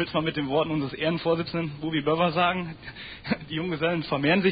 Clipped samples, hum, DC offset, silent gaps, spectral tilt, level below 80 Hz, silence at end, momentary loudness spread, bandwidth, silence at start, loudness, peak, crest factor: under 0.1%; none; under 0.1%; none; -10.5 dB/octave; -54 dBFS; 0 s; 9 LU; 5 kHz; 0 s; -26 LUFS; -10 dBFS; 16 dB